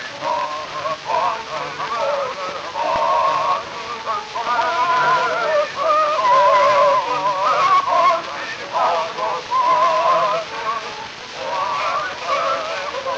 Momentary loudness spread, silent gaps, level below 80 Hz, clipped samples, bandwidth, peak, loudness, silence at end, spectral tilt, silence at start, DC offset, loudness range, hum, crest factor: 11 LU; none; -58 dBFS; under 0.1%; 8.4 kHz; -4 dBFS; -19 LUFS; 0 s; -2.5 dB/octave; 0 s; under 0.1%; 5 LU; none; 14 dB